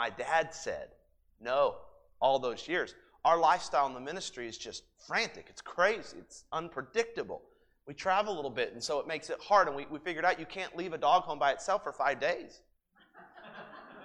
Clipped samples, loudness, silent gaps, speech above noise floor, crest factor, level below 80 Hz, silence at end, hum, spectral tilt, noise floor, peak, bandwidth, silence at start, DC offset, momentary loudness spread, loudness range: under 0.1%; -32 LUFS; none; 33 dB; 22 dB; -68 dBFS; 0 s; none; -3 dB/octave; -65 dBFS; -12 dBFS; 11.5 kHz; 0 s; under 0.1%; 20 LU; 4 LU